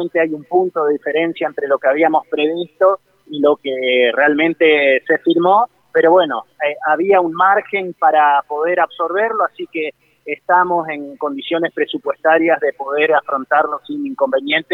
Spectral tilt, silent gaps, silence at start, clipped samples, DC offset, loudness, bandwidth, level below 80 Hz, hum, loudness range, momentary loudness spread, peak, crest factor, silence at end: -7 dB/octave; none; 0 s; under 0.1%; under 0.1%; -16 LUFS; 4.2 kHz; -70 dBFS; none; 4 LU; 10 LU; -2 dBFS; 14 dB; 0 s